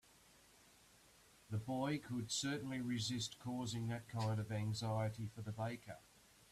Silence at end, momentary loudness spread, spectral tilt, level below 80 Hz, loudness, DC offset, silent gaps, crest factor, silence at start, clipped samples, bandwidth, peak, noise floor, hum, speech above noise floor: 0.5 s; 7 LU; -5 dB/octave; -72 dBFS; -43 LUFS; under 0.1%; none; 16 dB; 1.5 s; under 0.1%; 14 kHz; -28 dBFS; -68 dBFS; none; 25 dB